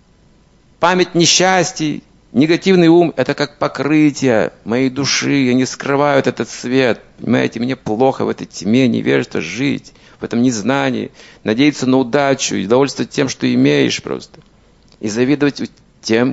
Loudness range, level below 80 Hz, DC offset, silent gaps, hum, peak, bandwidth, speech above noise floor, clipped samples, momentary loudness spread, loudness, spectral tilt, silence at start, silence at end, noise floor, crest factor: 4 LU; -52 dBFS; under 0.1%; none; none; 0 dBFS; 8 kHz; 35 dB; under 0.1%; 11 LU; -15 LUFS; -4.5 dB/octave; 0.8 s; 0 s; -50 dBFS; 16 dB